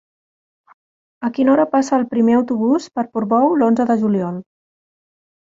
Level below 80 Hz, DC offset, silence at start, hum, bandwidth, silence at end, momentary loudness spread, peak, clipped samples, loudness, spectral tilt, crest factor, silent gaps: -62 dBFS; under 0.1%; 1.2 s; none; 7.8 kHz; 1 s; 10 LU; -4 dBFS; under 0.1%; -17 LUFS; -7 dB/octave; 14 dB; none